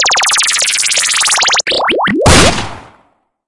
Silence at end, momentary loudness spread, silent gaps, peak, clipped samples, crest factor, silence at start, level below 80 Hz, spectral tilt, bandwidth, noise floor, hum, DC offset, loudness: 0.6 s; 5 LU; none; 0 dBFS; 0.5%; 12 dB; 0 s; -28 dBFS; -2 dB/octave; 12 kHz; -54 dBFS; none; under 0.1%; -9 LUFS